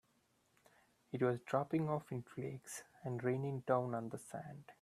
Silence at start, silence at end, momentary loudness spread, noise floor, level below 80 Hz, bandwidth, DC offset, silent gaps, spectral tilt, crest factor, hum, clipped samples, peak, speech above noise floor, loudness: 1.15 s; 0.1 s; 12 LU; -77 dBFS; -80 dBFS; 14.5 kHz; under 0.1%; none; -7 dB/octave; 22 dB; none; under 0.1%; -20 dBFS; 37 dB; -41 LUFS